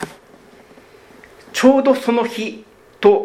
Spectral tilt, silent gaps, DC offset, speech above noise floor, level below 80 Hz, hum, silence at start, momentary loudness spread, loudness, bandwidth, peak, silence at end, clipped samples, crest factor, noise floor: -4.5 dB/octave; none; under 0.1%; 31 dB; -58 dBFS; none; 0 s; 17 LU; -16 LUFS; 15 kHz; 0 dBFS; 0 s; under 0.1%; 18 dB; -46 dBFS